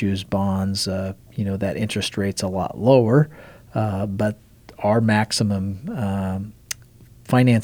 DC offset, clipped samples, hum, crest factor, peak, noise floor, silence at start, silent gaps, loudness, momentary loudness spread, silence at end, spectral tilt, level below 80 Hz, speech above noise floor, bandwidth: under 0.1%; under 0.1%; none; 20 dB; -2 dBFS; -47 dBFS; 0 s; none; -22 LUFS; 13 LU; 0 s; -6 dB/octave; -52 dBFS; 27 dB; 20 kHz